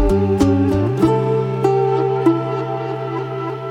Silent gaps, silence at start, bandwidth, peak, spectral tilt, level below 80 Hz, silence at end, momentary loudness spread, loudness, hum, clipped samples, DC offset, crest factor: none; 0 s; 12.5 kHz; -2 dBFS; -8.5 dB/octave; -32 dBFS; 0 s; 8 LU; -18 LUFS; none; under 0.1%; under 0.1%; 14 dB